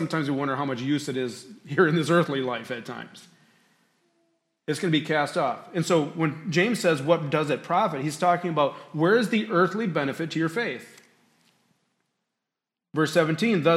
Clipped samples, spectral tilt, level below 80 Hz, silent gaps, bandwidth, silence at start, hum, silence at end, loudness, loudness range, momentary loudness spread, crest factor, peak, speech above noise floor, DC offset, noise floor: under 0.1%; -5.5 dB/octave; -74 dBFS; none; 14.5 kHz; 0 s; none; 0 s; -25 LUFS; 6 LU; 10 LU; 20 dB; -6 dBFS; 62 dB; under 0.1%; -87 dBFS